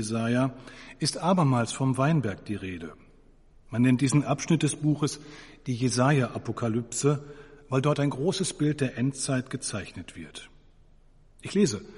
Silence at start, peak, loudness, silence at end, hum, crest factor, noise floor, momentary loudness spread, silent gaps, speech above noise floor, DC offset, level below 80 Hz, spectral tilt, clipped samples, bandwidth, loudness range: 0 s; -8 dBFS; -27 LUFS; 0 s; none; 18 dB; -56 dBFS; 18 LU; none; 29 dB; under 0.1%; -56 dBFS; -5.5 dB/octave; under 0.1%; 11.5 kHz; 4 LU